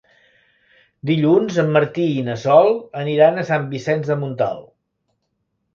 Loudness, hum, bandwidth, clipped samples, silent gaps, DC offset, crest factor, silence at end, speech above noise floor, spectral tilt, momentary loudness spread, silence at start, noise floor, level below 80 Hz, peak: -18 LUFS; none; 7.4 kHz; under 0.1%; none; under 0.1%; 18 dB; 1.15 s; 55 dB; -7.5 dB/octave; 9 LU; 1.05 s; -72 dBFS; -62 dBFS; 0 dBFS